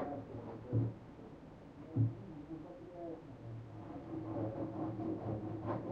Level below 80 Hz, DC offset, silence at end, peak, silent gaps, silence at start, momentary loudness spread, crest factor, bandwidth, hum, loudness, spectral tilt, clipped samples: -64 dBFS; under 0.1%; 0 s; -22 dBFS; none; 0 s; 15 LU; 20 dB; 5.2 kHz; none; -43 LUFS; -10.5 dB/octave; under 0.1%